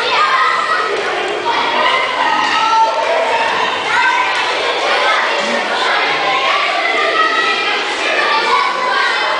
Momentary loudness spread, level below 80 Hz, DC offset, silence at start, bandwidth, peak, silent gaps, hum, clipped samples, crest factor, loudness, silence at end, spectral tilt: 3 LU; -58 dBFS; under 0.1%; 0 s; 10.5 kHz; 0 dBFS; none; none; under 0.1%; 14 dB; -13 LUFS; 0 s; -1 dB/octave